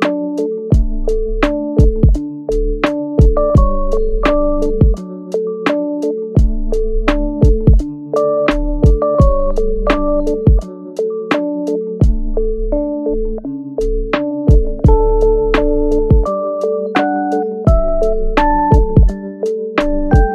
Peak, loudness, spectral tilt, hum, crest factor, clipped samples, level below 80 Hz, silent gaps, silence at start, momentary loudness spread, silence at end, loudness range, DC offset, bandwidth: 0 dBFS; -15 LUFS; -8.5 dB/octave; none; 12 dB; under 0.1%; -16 dBFS; none; 0 s; 7 LU; 0 s; 3 LU; under 0.1%; 7.6 kHz